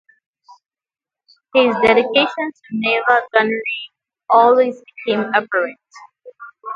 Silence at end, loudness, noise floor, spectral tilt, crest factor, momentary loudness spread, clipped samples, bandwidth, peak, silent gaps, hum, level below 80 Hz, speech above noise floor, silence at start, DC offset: 0 s; -16 LUFS; under -90 dBFS; -5.5 dB/octave; 18 dB; 13 LU; under 0.1%; 7.4 kHz; 0 dBFS; none; none; -60 dBFS; over 74 dB; 1.55 s; under 0.1%